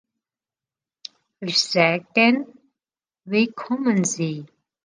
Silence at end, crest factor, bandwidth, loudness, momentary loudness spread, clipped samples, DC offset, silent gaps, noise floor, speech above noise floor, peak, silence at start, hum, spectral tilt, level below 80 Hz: 0.4 s; 22 dB; 10 kHz; -21 LUFS; 23 LU; under 0.1%; under 0.1%; none; under -90 dBFS; over 69 dB; -2 dBFS; 1.4 s; none; -4 dB/octave; -72 dBFS